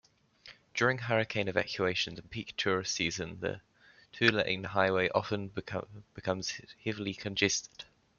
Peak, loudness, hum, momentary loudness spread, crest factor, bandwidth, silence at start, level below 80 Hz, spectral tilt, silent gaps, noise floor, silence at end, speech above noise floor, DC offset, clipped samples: -10 dBFS; -32 LUFS; none; 12 LU; 24 dB; 7.4 kHz; 0.45 s; -66 dBFS; -3.5 dB/octave; none; -57 dBFS; 0.35 s; 24 dB; under 0.1%; under 0.1%